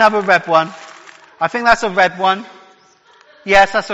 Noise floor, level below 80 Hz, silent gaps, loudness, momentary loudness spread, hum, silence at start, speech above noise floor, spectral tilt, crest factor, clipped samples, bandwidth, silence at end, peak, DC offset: -50 dBFS; -46 dBFS; none; -14 LUFS; 12 LU; none; 0 s; 36 dB; -3.5 dB/octave; 16 dB; 0.2%; 10 kHz; 0 s; 0 dBFS; under 0.1%